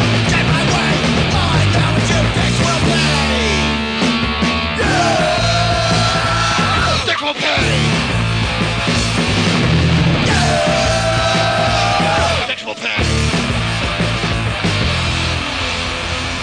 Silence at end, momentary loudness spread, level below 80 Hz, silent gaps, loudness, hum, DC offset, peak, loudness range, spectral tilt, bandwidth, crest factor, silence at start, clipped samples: 0 s; 4 LU; -28 dBFS; none; -15 LUFS; none; under 0.1%; 0 dBFS; 3 LU; -4.5 dB/octave; 10 kHz; 14 dB; 0 s; under 0.1%